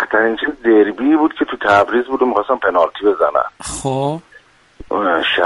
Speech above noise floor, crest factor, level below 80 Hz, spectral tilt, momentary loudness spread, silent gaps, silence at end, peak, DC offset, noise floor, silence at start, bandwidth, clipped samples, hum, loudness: 32 dB; 14 dB; -48 dBFS; -4.5 dB/octave; 9 LU; none; 0 s; 0 dBFS; under 0.1%; -47 dBFS; 0 s; 11.5 kHz; under 0.1%; none; -16 LUFS